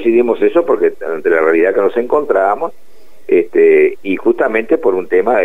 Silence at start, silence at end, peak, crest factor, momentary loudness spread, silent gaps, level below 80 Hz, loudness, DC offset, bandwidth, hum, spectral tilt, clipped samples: 0 s; 0 s; -2 dBFS; 12 dB; 6 LU; none; -52 dBFS; -13 LUFS; 3%; 3.9 kHz; none; -7 dB/octave; under 0.1%